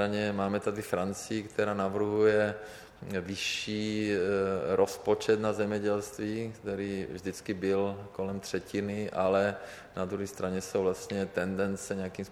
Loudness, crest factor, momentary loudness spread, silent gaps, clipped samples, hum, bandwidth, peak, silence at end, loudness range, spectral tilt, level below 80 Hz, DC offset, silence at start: -31 LUFS; 18 dB; 9 LU; none; under 0.1%; none; 17 kHz; -12 dBFS; 0 s; 3 LU; -5 dB/octave; -64 dBFS; under 0.1%; 0 s